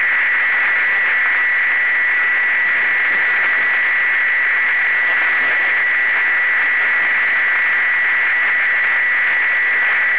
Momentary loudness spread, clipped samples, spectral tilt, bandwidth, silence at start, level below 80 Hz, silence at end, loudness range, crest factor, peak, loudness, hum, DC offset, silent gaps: 0 LU; under 0.1%; -3 dB/octave; 4 kHz; 0 s; -70 dBFS; 0 s; 0 LU; 10 dB; -6 dBFS; -13 LUFS; none; 1%; none